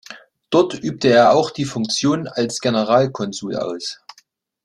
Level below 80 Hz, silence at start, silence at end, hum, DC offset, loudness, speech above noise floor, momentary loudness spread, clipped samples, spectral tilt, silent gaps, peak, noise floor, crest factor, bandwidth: -60 dBFS; 0.1 s; 0.7 s; none; under 0.1%; -18 LUFS; 39 dB; 13 LU; under 0.1%; -4.5 dB/octave; none; -2 dBFS; -57 dBFS; 16 dB; 12 kHz